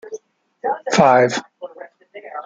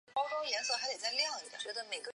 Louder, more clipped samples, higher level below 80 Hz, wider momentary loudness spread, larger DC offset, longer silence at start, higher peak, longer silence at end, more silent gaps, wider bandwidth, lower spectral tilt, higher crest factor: first, -17 LUFS vs -36 LUFS; neither; first, -60 dBFS vs -88 dBFS; first, 24 LU vs 8 LU; neither; about the same, 0.05 s vs 0.1 s; first, 0 dBFS vs -20 dBFS; about the same, 0 s vs 0.05 s; neither; second, 9.4 kHz vs 11 kHz; first, -4.5 dB/octave vs 2 dB/octave; about the same, 20 dB vs 18 dB